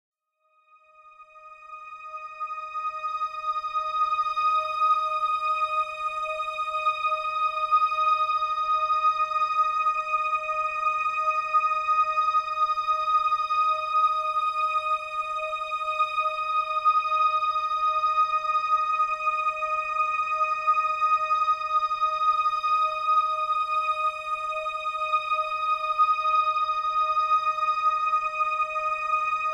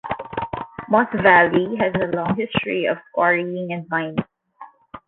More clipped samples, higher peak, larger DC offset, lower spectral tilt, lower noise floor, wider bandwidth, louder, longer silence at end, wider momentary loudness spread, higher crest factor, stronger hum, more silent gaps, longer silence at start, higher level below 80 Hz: neither; second, -12 dBFS vs -2 dBFS; neither; second, -0.5 dB/octave vs -9.5 dB/octave; first, -69 dBFS vs -45 dBFS; first, 10 kHz vs 4.3 kHz; second, -25 LUFS vs -20 LUFS; about the same, 0 s vs 0.1 s; second, 6 LU vs 14 LU; second, 12 dB vs 20 dB; neither; neither; first, 1.05 s vs 0.05 s; second, -64 dBFS vs -52 dBFS